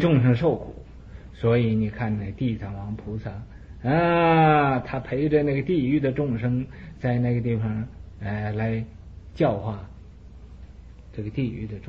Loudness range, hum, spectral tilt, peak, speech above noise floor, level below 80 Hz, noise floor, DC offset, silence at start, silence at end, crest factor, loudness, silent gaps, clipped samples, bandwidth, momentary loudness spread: 8 LU; none; -9.5 dB/octave; -6 dBFS; 21 dB; -44 dBFS; -44 dBFS; 0.1%; 0 s; 0 s; 18 dB; -24 LUFS; none; under 0.1%; 5.4 kHz; 20 LU